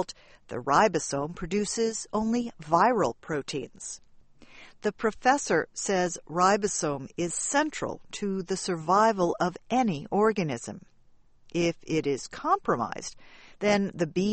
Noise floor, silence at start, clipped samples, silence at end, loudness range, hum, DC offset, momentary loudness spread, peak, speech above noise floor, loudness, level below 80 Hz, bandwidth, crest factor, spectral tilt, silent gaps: -57 dBFS; 0 s; under 0.1%; 0 s; 3 LU; none; under 0.1%; 12 LU; -8 dBFS; 30 dB; -27 LUFS; -56 dBFS; 8.8 kHz; 20 dB; -4.5 dB/octave; none